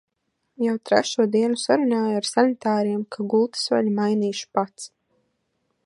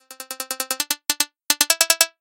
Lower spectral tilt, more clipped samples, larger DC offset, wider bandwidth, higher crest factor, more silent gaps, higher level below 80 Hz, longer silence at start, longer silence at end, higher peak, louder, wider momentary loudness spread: first, -4.5 dB/octave vs 2.5 dB/octave; neither; neither; second, 11.5 kHz vs 18 kHz; about the same, 22 dB vs 24 dB; neither; second, -74 dBFS vs -66 dBFS; first, 0.6 s vs 0.1 s; first, 1 s vs 0.15 s; about the same, -2 dBFS vs 0 dBFS; second, -22 LUFS vs -19 LUFS; second, 6 LU vs 14 LU